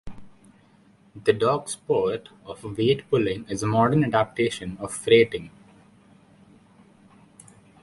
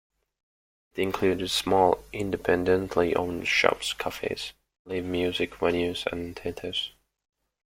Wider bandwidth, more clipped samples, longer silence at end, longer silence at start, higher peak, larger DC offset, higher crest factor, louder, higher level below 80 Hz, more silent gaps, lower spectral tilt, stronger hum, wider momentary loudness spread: second, 11.5 kHz vs 16.5 kHz; neither; first, 2.35 s vs 0.85 s; second, 0.05 s vs 0.95 s; about the same, -4 dBFS vs -2 dBFS; neither; second, 20 dB vs 26 dB; first, -23 LUFS vs -27 LUFS; about the same, -56 dBFS vs -54 dBFS; second, none vs 4.79-4.85 s; first, -5.5 dB/octave vs -4 dB/octave; neither; first, 15 LU vs 12 LU